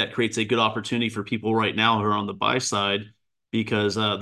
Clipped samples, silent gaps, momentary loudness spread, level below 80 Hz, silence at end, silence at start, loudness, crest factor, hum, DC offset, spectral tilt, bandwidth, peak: under 0.1%; none; 7 LU; -58 dBFS; 0 s; 0 s; -24 LUFS; 20 dB; none; under 0.1%; -4 dB/octave; 12.5 kHz; -4 dBFS